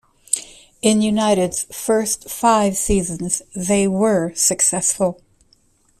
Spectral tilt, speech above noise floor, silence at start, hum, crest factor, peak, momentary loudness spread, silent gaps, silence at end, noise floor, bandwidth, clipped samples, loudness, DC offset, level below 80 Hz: -4 dB/octave; 40 dB; 0.3 s; none; 18 dB; 0 dBFS; 7 LU; none; 0.85 s; -58 dBFS; 15.5 kHz; under 0.1%; -18 LUFS; under 0.1%; -40 dBFS